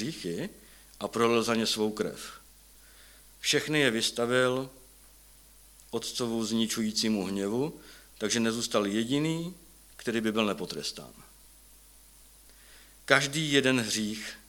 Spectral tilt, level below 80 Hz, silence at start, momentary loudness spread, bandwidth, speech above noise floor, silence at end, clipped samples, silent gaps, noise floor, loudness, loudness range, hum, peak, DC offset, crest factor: -3.5 dB/octave; -62 dBFS; 0 s; 14 LU; 19 kHz; 27 dB; 0.1 s; under 0.1%; none; -56 dBFS; -29 LUFS; 4 LU; none; -2 dBFS; under 0.1%; 28 dB